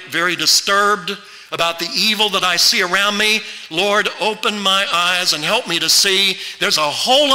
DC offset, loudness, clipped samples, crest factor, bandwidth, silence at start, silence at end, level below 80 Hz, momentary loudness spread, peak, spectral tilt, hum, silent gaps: under 0.1%; -14 LUFS; under 0.1%; 12 dB; 16.5 kHz; 0 s; 0 s; -58 dBFS; 7 LU; -4 dBFS; -1 dB/octave; none; none